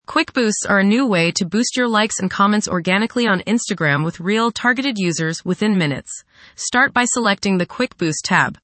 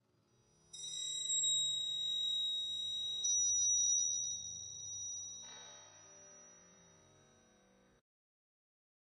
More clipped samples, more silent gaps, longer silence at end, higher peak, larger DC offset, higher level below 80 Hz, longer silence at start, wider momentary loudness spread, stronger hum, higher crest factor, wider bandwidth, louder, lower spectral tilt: neither; neither; second, 0.05 s vs 2.4 s; first, -2 dBFS vs -26 dBFS; neither; first, -56 dBFS vs -78 dBFS; second, 0.1 s vs 0.75 s; second, 6 LU vs 20 LU; neither; about the same, 16 dB vs 14 dB; second, 8.8 kHz vs 13 kHz; first, -18 LUFS vs -34 LUFS; first, -4 dB/octave vs 2.5 dB/octave